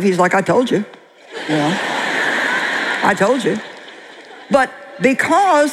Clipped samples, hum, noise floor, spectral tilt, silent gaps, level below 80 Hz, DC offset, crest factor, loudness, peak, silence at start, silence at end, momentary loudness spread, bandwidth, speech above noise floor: under 0.1%; none; -38 dBFS; -4.5 dB/octave; none; -60 dBFS; under 0.1%; 16 dB; -16 LUFS; -2 dBFS; 0 s; 0 s; 20 LU; 15 kHz; 23 dB